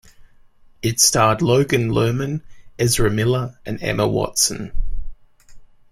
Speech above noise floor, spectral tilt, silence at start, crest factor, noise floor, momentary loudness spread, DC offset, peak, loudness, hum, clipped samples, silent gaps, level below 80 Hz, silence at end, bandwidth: 30 dB; -4 dB/octave; 0.2 s; 18 dB; -48 dBFS; 15 LU; under 0.1%; -2 dBFS; -18 LUFS; none; under 0.1%; none; -32 dBFS; 0.25 s; 16 kHz